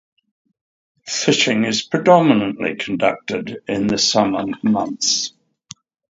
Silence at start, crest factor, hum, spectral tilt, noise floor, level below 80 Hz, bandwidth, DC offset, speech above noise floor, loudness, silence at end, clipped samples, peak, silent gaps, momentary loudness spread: 1.05 s; 18 dB; none; -3.5 dB/octave; -44 dBFS; -58 dBFS; 7.8 kHz; under 0.1%; 26 dB; -18 LUFS; 0.85 s; under 0.1%; 0 dBFS; none; 12 LU